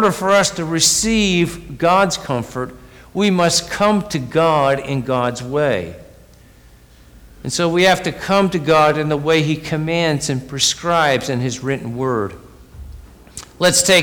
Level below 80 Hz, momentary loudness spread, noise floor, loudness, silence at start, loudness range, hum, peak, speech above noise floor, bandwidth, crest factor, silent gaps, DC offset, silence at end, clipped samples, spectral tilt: -42 dBFS; 10 LU; -45 dBFS; -17 LUFS; 0 s; 4 LU; none; -4 dBFS; 29 dB; over 20 kHz; 14 dB; none; under 0.1%; 0 s; under 0.1%; -3.5 dB/octave